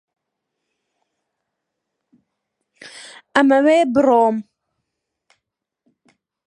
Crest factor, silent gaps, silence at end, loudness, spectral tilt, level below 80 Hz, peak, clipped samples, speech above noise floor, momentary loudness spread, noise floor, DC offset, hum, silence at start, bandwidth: 22 dB; none; 2.05 s; -15 LUFS; -5 dB/octave; -66 dBFS; 0 dBFS; under 0.1%; 66 dB; 24 LU; -80 dBFS; under 0.1%; none; 2.85 s; 11 kHz